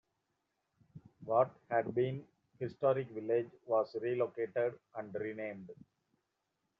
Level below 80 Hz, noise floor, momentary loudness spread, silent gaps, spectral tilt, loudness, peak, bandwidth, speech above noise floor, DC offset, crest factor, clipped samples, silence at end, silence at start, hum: -80 dBFS; -84 dBFS; 13 LU; none; -6.5 dB/octave; -36 LUFS; -16 dBFS; 5.6 kHz; 49 dB; under 0.1%; 20 dB; under 0.1%; 1.05 s; 0.95 s; none